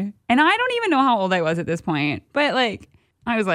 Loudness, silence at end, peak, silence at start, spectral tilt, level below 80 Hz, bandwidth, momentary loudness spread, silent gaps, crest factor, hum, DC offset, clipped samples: -20 LUFS; 0 s; -4 dBFS; 0 s; -5.5 dB/octave; -58 dBFS; 11.5 kHz; 8 LU; none; 16 dB; none; under 0.1%; under 0.1%